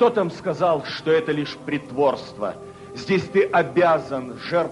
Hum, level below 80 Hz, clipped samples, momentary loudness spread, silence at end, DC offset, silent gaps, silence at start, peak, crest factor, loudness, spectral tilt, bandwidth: none; -60 dBFS; under 0.1%; 11 LU; 0 s; under 0.1%; none; 0 s; -6 dBFS; 16 dB; -22 LUFS; -6.5 dB/octave; 11.5 kHz